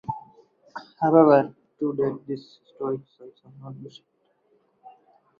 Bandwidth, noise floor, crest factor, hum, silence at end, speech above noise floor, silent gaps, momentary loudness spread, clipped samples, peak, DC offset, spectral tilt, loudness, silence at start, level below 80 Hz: 6.6 kHz; -66 dBFS; 22 dB; none; 1.5 s; 43 dB; none; 25 LU; under 0.1%; -4 dBFS; under 0.1%; -9.5 dB/octave; -23 LUFS; 0.1 s; -68 dBFS